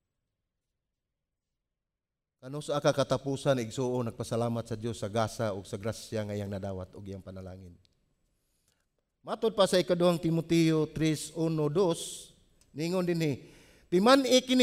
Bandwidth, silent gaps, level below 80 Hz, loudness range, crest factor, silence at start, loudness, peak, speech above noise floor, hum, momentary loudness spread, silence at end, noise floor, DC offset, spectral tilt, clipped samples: 16 kHz; none; -62 dBFS; 11 LU; 22 dB; 2.45 s; -29 LUFS; -10 dBFS; 60 dB; none; 17 LU; 0 s; -89 dBFS; under 0.1%; -5.5 dB/octave; under 0.1%